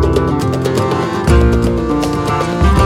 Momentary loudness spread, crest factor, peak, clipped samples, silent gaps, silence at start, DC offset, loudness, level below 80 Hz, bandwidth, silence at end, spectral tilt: 4 LU; 12 dB; 0 dBFS; under 0.1%; none; 0 s; under 0.1%; -14 LUFS; -18 dBFS; 15.5 kHz; 0 s; -7 dB/octave